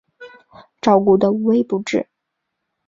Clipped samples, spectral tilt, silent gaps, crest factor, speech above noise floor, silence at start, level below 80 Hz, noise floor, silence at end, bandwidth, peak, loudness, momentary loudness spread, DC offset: under 0.1%; -7 dB/octave; none; 18 dB; 62 dB; 0.2 s; -60 dBFS; -77 dBFS; 0.85 s; 7.8 kHz; -2 dBFS; -17 LUFS; 10 LU; under 0.1%